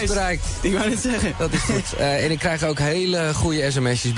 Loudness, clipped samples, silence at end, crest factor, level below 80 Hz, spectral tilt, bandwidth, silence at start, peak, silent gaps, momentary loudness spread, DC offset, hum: -21 LUFS; under 0.1%; 0 s; 14 dB; -32 dBFS; -4.5 dB/octave; 11 kHz; 0 s; -8 dBFS; none; 2 LU; under 0.1%; none